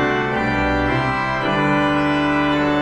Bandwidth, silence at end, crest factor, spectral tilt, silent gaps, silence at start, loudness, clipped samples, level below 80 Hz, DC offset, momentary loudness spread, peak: 8.8 kHz; 0 s; 12 dB; -6.5 dB/octave; none; 0 s; -18 LUFS; under 0.1%; -36 dBFS; under 0.1%; 2 LU; -6 dBFS